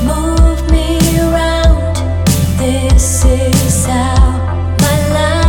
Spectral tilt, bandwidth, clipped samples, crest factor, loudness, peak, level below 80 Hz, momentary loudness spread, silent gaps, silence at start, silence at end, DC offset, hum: -5 dB/octave; 18 kHz; under 0.1%; 10 dB; -12 LUFS; 0 dBFS; -14 dBFS; 3 LU; none; 0 s; 0 s; under 0.1%; none